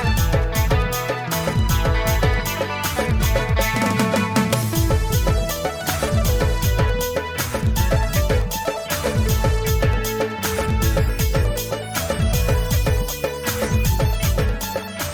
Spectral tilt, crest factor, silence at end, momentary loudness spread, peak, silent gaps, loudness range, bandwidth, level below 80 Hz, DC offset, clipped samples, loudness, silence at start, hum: -5 dB/octave; 12 dB; 0 s; 4 LU; -8 dBFS; none; 1 LU; over 20 kHz; -24 dBFS; under 0.1%; under 0.1%; -21 LUFS; 0 s; none